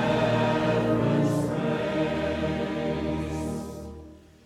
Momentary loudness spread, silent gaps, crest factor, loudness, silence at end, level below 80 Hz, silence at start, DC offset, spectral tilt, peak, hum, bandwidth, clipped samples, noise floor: 12 LU; none; 14 dB; -26 LUFS; 0.3 s; -46 dBFS; 0 s; under 0.1%; -7 dB/octave; -12 dBFS; none; 14.5 kHz; under 0.1%; -47 dBFS